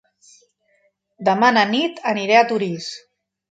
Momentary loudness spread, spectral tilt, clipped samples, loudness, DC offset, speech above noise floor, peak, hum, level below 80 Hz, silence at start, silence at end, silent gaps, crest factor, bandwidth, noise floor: 14 LU; -4.5 dB/octave; under 0.1%; -18 LUFS; under 0.1%; 46 dB; 0 dBFS; none; -72 dBFS; 1.2 s; 0.55 s; none; 20 dB; 9 kHz; -64 dBFS